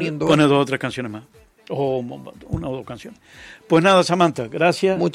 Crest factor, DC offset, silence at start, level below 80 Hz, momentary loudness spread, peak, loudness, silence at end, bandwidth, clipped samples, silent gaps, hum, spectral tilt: 18 dB; under 0.1%; 0 s; -50 dBFS; 19 LU; -2 dBFS; -19 LUFS; 0 s; 15 kHz; under 0.1%; none; none; -5.5 dB/octave